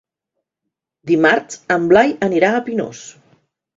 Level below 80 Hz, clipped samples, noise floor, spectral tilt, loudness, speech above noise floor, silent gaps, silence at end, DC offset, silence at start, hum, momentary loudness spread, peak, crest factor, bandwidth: -56 dBFS; under 0.1%; -80 dBFS; -5 dB/octave; -15 LUFS; 64 dB; none; 0.65 s; under 0.1%; 1.05 s; none; 15 LU; 0 dBFS; 18 dB; 7.8 kHz